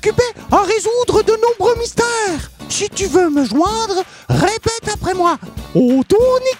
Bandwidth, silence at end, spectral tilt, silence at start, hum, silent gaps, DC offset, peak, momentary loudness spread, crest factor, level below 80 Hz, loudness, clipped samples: 16.5 kHz; 0 s; -4.5 dB/octave; 0.05 s; none; none; under 0.1%; 0 dBFS; 7 LU; 16 dB; -36 dBFS; -15 LUFS; under 0.1%